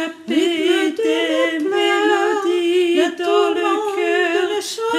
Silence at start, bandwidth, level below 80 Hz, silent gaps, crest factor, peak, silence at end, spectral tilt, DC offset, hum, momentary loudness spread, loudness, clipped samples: 0 s; 14.5 kHz; -74 dBFS; none; 14 dB; -4 dBFS; 0 s; -2 dB/octave; under 0.1%; none; 3 LU; -17 LUFS; under 0.1%